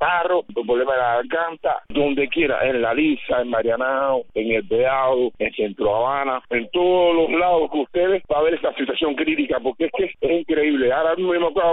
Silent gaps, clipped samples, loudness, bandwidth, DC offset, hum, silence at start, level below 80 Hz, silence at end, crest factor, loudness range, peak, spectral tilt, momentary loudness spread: none; under 0.1%; -20 LUFS; 4 kHz; under 0.1%; none; 0 s; -48 dBFS; 0 s; 12 dB; 1 LU; -8 dBFS; -2.5 dB/octave; 5 LU